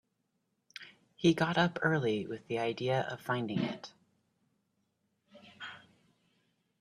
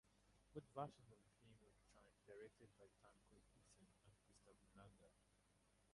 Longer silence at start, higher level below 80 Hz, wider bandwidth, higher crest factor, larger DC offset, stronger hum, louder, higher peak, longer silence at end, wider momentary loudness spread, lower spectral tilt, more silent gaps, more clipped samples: first, 0.8 s vs 0.05 s; first, -72 dBFS vs -82 dBFS; first, 13.5 kHz vs 11 kHz; second, 22 dB vs 28 dB; neither; neither; first, -32 LUFS vs -59 LUFS; first, -14 dBFS vs -36 dBFS; first, 1 s vs 0 s; first, 20 LU vs 14 LU; about the same, -6 dB/octave vs -6 dB/octave; neither; neither